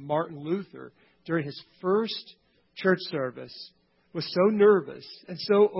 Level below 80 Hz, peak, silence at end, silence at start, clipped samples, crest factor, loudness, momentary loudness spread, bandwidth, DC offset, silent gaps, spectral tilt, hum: -72 dBFS; -10 dBFS; 0 s; 0 s; under 0.1%; 18 dB; -27 LUFS; 23 LU; 5.8 kHz; under 0.1%; none; -9.5 dB/octave; none